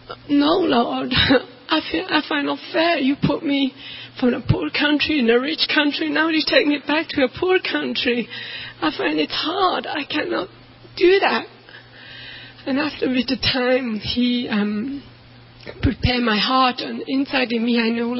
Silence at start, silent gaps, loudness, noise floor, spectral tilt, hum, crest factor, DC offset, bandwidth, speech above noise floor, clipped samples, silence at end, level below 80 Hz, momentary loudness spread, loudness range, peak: 0.1 s; none; -20 LUFS; -45 dBFS; -8.5 dB/octave; none; 18 dB; under 0.1%; 5.8 kHz; 25 dB; under 0.1%; 0 s; -42 dBFS; 13 LU; 4 LU; -2 dBFS